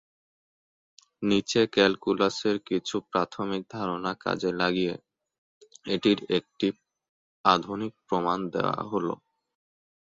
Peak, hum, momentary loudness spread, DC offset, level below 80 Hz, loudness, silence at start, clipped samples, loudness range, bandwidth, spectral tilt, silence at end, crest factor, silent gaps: -4 dBFS; none; 9 LU; under 0.1%; -64 dBFS; -27 LUFS; 1.2 s; under 0.1%; 3 LU; 7.8 kHz; -5 dB/octave; 0.95 s; 24 dB; 5.38-5.61 s, 7.09-7.44 s